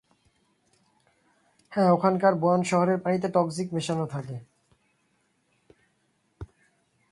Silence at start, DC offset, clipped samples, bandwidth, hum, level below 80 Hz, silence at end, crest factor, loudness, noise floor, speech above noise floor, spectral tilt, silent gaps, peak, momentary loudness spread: 1.7 s; under 0.1%; under 0.1%; 11.5 kHz; none; -62 dBFS; 0.65 s; 22 dB; -25 LUFS; -71 dBFS; 47 dB; -6.5 dB/octave; none; -8 dBFS; 24 LU